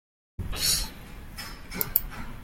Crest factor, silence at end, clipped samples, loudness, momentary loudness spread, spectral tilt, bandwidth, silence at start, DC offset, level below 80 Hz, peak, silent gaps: 32 dB; 0 s; under 0.1%; -27 LUFS; 18 LU; -1.5 dB/octave; 17 kHz; 0.4 s; under 0.1%; -40 dBFS; 0 dBFS; none